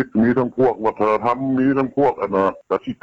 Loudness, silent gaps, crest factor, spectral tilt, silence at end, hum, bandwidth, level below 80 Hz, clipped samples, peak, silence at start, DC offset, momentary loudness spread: -19 LUFS; none; 12 dB; -9 dB/octave; 0.1 s; none; 6.8 kHz; -52 dBFS; under 0.1%; -6 dBFS; 0 s; under 0.1%; 3 LU